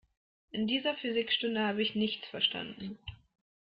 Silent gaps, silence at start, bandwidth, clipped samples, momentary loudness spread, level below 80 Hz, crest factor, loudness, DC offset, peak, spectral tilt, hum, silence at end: none; 0.55 s; 5.4 kHz; under 0.1%; 13 LU; -66 dBFS; 20 dB; -32 LUFS; under 0.1%; -14 dBFS; -7.5 dB/octave; none; 0.55 s